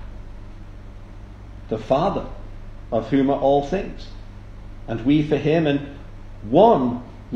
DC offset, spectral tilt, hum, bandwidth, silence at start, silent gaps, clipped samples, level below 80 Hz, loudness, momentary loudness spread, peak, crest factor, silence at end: under 0.1%; -8 dB/octave; 50 Hz at -45 dBFS; 7.4 kHz; 0 s; none; under 0.1%; -38 dBFS; -20 LUFS; 25 LU; 0 dBFS; 22 dB; 0 s